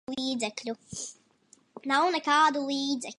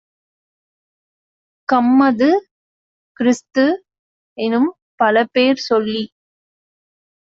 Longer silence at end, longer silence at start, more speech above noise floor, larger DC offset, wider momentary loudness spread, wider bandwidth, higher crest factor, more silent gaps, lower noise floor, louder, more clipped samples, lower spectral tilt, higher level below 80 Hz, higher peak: second, 0.05 s vs 1.2 s; second, 0.1 s vs 1.7 s; second, 35 dB vs over 75 dB; neither; first, 15 LU vs 11 LU; first, 11.5 kHz vs 7.6 kHz; about the same, 18 dB vs 16 dB; second, none vs 2.51-3.15 s, 3.99-4.36 s, 4.82-4.98 s; second, -63 dBFS vs under -90 dBFS; second, -28 LUFS vs -17 LUFS; neither; about the same, -2 dB/octave vs -3 dB/octave; second, -72 dBFS vs -64 dBFS; second, -12 dBFS vs -2 dBFS